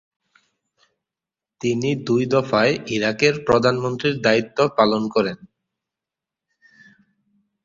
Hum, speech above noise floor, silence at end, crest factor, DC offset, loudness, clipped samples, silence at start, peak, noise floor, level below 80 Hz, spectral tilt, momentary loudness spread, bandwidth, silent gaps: none; 69 dB; 2.3 s; 20 dB; under 0.1%; -20 LUFS; under 0.1%; 1.65 s; -2 dBFS; -88 dBFS; -56 dBFS; -5.5 dB/octave; 5 LU; 7.6 kHz; none